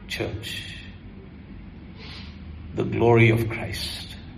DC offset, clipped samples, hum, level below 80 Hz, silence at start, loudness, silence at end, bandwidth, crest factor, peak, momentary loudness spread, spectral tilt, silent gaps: under 0.1%; under 0.1%; none; -44 dBFS; 0 s; -23 LUFS; 0 s; 14 kHz; 20 dB; -6 dBFS; 25 LU; -6.5 dB/octave; none